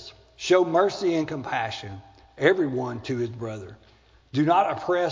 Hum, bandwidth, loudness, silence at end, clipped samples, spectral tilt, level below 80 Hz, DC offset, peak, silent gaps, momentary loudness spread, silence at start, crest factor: none; 7.6 kHz; -25 LUFS; 0 s; under 0.1%; -6 dB/octave; -58 dBFS; under 0.1%; -6 dBFS; none; 17 LU; 0 s; 20 dB